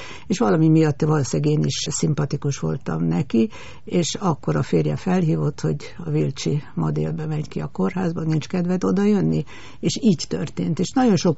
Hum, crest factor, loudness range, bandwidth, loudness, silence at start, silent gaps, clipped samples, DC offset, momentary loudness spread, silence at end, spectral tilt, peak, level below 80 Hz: none; 14 dB; 3 LU; 8 kHz; -22 LUFS; 0 s; none; under 0.1%; 1%; 8 LU; 0 s; -7 dB/octave; -6 dBFS; -50 dBFS